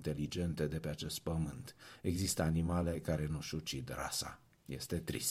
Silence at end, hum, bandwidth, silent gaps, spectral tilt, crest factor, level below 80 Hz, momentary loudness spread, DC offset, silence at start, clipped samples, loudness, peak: 0 s; none; 16 kHz; none; -5 dB/octave; 16 dB; -52 dBFS; 12 LU; under 0.1%; 0 s; under 0.1%; -39 LUFS; -22 dBFS